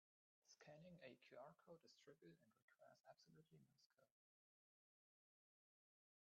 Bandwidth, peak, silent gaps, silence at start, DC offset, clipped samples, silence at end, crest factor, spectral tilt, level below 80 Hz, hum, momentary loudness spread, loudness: 7 kHz; -48 dBFS; 2.62-2.68 s, 3.86-3.90 s; 0.45 s; under 0.1%; under 0.1%; 2.3 s; 22 dB; -4.5 dB/octave; under -90 dBFS; none; 5 LU; -66 LUFS